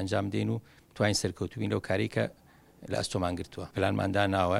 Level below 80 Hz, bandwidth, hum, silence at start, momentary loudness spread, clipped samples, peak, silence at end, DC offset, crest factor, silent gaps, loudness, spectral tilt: -56 dBFS; 14.5 kHz; none; 0 s; 9 LU; under 0.1%; -10 dBFS; 0 s; under 0.1%; 20 dB; none; -31 LUFS; -5 dB/octave